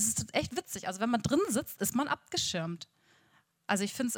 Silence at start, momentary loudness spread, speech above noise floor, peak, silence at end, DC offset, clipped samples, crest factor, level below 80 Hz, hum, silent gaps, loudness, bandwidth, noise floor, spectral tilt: 0 s; 10 LU; 36 dB; -12 dBFS; 0 s; under 0.1%; under 0.1%; 20 dB; -62 dBFS; none; none; -32 LUFS; 18 kHz; -69 dBFS; -3.5 dB/octave